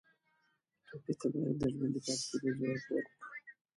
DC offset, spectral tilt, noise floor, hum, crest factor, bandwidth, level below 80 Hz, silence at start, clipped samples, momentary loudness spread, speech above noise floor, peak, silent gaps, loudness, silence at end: under 0.1%; -5 dB/octave; -78 dBFS; none; 18 dB; 11.5 kHz; -66 dBFS; 0.9 s; under 0.1%; 14 LU; 42 dB; -22 dBFS; none; -37 LUFS; 0.25 s